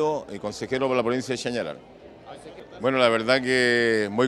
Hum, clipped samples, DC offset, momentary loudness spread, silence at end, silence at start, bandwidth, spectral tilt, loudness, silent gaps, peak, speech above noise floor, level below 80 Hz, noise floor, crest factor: none; under 0.1%; under 0.1%; 22 LU; 0 s; 0 s; 12 kHz; -4.5 dB/octave; -23 LUFS; none; -4 dBFS; 20 dB; -60 dBFS; -44 dBFS; 20 dB